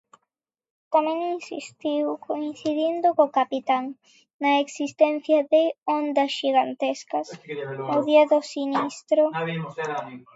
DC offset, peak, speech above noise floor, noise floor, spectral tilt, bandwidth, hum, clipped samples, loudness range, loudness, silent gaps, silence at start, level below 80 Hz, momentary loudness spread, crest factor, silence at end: under 0.1%; -6 dBFS; 58 dB; -81 dBFS; -5 dB/octave; 8 kHz; none; under 0.1%; 2 LU; -24 LUFS; 4.33-4.39 s; 0.9 s; -80 dBFS; 11 LU; 18 dB; 0.15 s